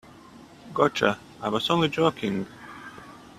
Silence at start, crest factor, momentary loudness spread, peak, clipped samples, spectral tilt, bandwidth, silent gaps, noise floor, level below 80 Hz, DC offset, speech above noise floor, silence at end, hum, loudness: 0.35 s; 24 dB; 20 LU; -4 dBFS; under 0.1%; -5.5 dB/octave; 14.5 kHz; none; -48 dBFS; -60 dBFS; under 0.1%; 24 dB; 0.15 s; none; -25 LUFS